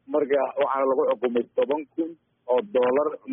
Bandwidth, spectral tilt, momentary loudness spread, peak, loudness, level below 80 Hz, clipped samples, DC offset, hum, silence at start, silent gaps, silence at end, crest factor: 3.7 kHz; -0.5 dB/octave; 9 LU; -12 dBFS; -24 LUFS; -76 dBFS; under 0.1%; under 0.1%; none; 0.1 s; none; 0 s; 12 dB